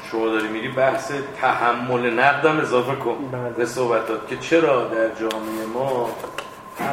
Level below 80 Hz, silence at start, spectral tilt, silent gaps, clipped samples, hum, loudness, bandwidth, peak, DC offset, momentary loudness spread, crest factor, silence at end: -60 dBFS; 0 s; -5 dB/octave; none; under 0.1%; none; -21 LUFS; 16.5 kHz; 0 dBFS; under 0.1%; 10 LU; 20 dB; 0 s